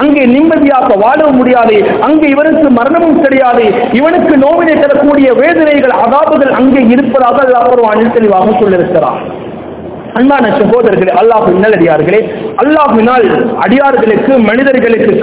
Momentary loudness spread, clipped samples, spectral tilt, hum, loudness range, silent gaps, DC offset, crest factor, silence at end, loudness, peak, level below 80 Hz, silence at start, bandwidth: 4 LU; 5%; -10 dB/octave; none; 2 LU; none; under 0.1%; 6 dB; 0 s; -7 LUFS; 0 dBFS; -40 dBFS; 0 s; 4 kHz